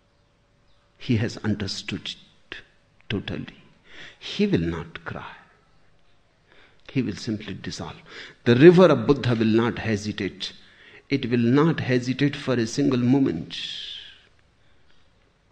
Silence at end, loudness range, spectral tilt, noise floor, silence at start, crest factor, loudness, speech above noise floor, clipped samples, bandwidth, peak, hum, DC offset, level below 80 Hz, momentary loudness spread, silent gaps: 1.4 s; 12 LU; -6.5 dB/octave; -63 dBFS; 1 s; 24 dB; -23 LUFS; 40 dB; under 0.1%; 9.2 kHz; 0 dBFS; none; under 0.1%; -52 dBFS; 21 LU; none